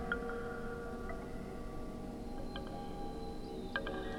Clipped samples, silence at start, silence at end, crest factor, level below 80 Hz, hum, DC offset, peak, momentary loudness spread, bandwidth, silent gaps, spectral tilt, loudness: under 0.1%; 0 s; 0 s; 22 dB; -48 dBFS; none; under 0.1%; -18 dBFS; 6 LU; 16.5 kHz; none; -6 dB/octave; -44 LUFS